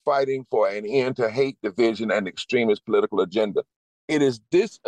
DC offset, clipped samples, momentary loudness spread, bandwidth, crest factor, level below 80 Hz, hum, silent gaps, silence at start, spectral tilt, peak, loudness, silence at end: under 0.1%; under 0.1%; 4 LU; 9.8 kHz; 14 dB; -70 dBFS; none; 3.76-4.08 s; 0.05 s; -5.5 dB/octave; -10 dBFS; -23 LUFS; 0.15 s